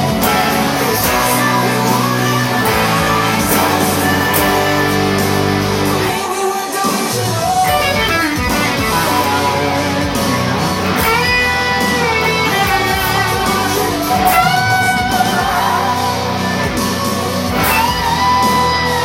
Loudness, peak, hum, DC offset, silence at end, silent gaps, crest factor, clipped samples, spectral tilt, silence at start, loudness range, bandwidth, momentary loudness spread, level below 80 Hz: -14 LUFS; 0 dBFS; none; under 0.1%; 0 s; none; 14 dB; under 0.1%; -4 dB/octave; 0 s; 2 LU; 17 kHz; 4 LU; -34 dBFS